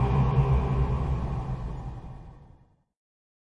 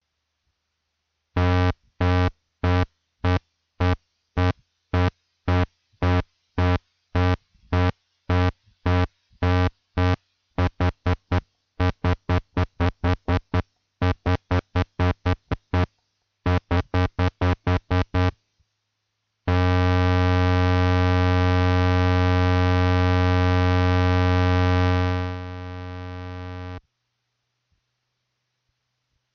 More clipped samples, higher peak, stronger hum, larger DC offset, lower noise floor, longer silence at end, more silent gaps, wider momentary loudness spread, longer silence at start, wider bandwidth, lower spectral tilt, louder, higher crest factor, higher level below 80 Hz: neither; second, -12 dBFS vs -8 dBFS; neither; neither; second, -58 dBFS vs -77 dBFS; second, 1.05 s vs 2.55 s; neither; first, 19 LU vs 11 LU; second, 0 s vs 1.35 s; about the same, 6 kHz vs 6.4 kHz; first, -9.5 dB/octave vs -7.5 dB/octave; second, -28 LUFS vs -23 LUFS; about the same, 16 dB vs 14 dB; about the same, -32 dBFS vs -36 dBFS